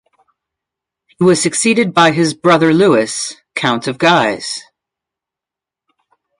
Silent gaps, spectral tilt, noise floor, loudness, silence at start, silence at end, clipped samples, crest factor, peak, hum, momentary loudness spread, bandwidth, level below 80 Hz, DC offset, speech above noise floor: none; -4 dB/octave; -86 dBFS; -13 LUFS; 1.2 s; 1.75 s; under 0.1%; 16 dB; 0 dBFS; none; 11 LU; 11 kHz; -60 dBFS; under 0.1%; 74 dB